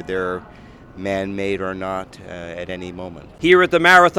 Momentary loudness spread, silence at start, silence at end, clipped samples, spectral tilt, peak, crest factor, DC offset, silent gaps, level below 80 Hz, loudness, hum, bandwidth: 21 LU; 0 s; 0 s; under 0.1%; -5 dB/octave; 0 dBFS; 18 dB; under 0.1%; none; -48 dBFS; -18 LUFS; none; 15.5 kHz